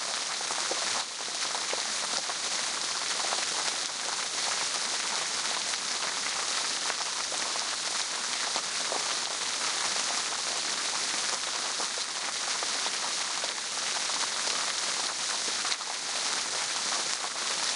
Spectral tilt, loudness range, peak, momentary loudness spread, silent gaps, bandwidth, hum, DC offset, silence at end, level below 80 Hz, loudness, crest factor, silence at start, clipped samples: 1.5 dB/octave; 1 LU; -8 dBFS; 2 LU; none; 11.5 kHz; none; under 0.1%; 0 s; -76 dBFS; -29 LUFS; 22 dB; 0 s; under 0.1%